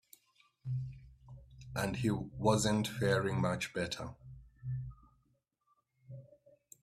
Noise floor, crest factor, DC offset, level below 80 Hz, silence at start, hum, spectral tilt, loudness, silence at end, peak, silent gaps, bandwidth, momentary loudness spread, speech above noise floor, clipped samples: -78 dBFS; 22 dB; under 0.1%; -60 dBFS; 0.65 s; none; -5.5 dB/octave; -35 LUFS; 0.55 s; -16 dBFS; none; 15 kHz; 23 LU; 44 dB; under 0.1%